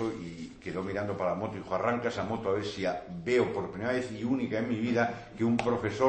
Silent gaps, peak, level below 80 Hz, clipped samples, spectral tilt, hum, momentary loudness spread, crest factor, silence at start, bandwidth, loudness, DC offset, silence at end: none; -10 dBFS; -60 dBFS; under 0.1%; -6.5 dB/octave; none; 8 LU; 20 dB; 0 s; 8.8 kHz; -31 LUFS; under 0.1%; 0 s